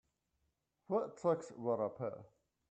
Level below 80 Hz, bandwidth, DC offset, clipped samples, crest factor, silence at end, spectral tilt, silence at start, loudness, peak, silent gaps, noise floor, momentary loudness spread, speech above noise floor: -82 dBFS; 8.8 kHz; under 0.1%; under 0.1%; 20 dB; 0.45 s; -8 dB/octave; 0.9 s; -39 LUFS; -22 dBFS; none; -84 dBFS; 8 LU; 45 dB